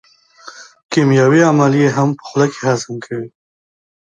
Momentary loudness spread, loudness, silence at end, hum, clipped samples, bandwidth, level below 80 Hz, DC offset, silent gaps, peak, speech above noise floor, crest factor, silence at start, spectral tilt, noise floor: 15 LU; -14 LUFS; 0.8 s; none; under 0.1%; 9.2 kHz; -60 dBFS; under 0.1%; 0.85-0.89 s; 0 dBFS; 27 dB; 16 dB; 0.45 s; -6.5 dB/octave; -40 dBFS